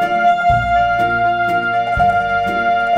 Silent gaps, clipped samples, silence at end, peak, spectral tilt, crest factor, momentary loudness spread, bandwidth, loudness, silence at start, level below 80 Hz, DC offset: none; under 0.1%; 0 s; -4 dBFS; -6 dB/octave; 10 dB; 3 LU; 8.8 kHz; -15 LUFS; 0 s; -34 dBFS; under 0.1%